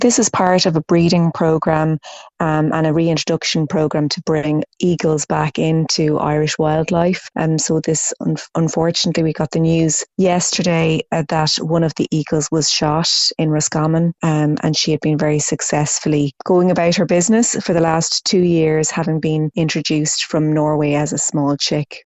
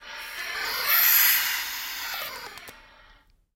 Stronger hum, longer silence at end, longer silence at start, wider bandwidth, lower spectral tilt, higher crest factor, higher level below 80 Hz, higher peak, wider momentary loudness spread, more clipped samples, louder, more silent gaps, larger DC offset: neither; second, 0.05 s vs 0.75 s; about the same, 0 s vs 0 s; second, 8.4 kHz vs 16.5 kHz; first, -4.5 dB/octave vs 2.5 dB/octave; second, 16 dB vs 22 dB; first, -48 dBFS vs -60 dBFS; first, 0 dBFS vs -6 dBFS; second, 5 LU vs 21 LU; neither; first, -16 LUFS vs -22 LUFS; neither; neither